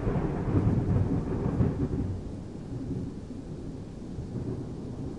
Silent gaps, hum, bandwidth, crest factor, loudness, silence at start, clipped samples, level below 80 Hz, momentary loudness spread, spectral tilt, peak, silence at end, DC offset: none; none; 10.5 kHz; 18 dB; -32 LUFS; 0 s; under 0.1%; -40 dBFS; 13 LU; -9.5 dB/octave; -12 dBFS; 0 s; 0.2%